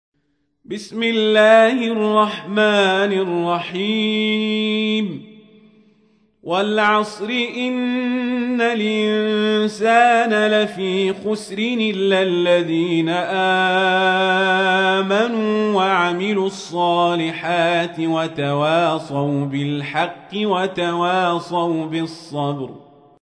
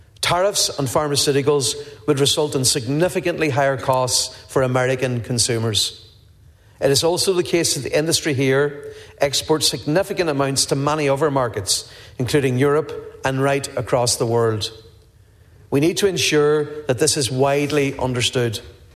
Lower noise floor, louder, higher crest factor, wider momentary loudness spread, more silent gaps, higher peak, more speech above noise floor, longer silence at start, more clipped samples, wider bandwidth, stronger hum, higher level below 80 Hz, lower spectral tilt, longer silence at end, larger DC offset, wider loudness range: first, -68 dBFS vs -50 dBFS; about the same, -18 LUFS vs -19 LUFS; about the same, 16 dB vs 18 dB; about the same, 8 LU vs 6 LU; neither; about the same, -2 dBFS vs -2 dBFS; first, 50 dB vs 31 dB; first, 0.7 s vs 0.2 s; neither; second, 10.5 kHz vs 14 kHz; neither; second, -66 dBFS vs -50 dBFS; first, -5.5 dB/octave vs -3.5 dB/octave; first, 0.55 s vs 0.25 s; neither; first, 5 LU vs 2 LU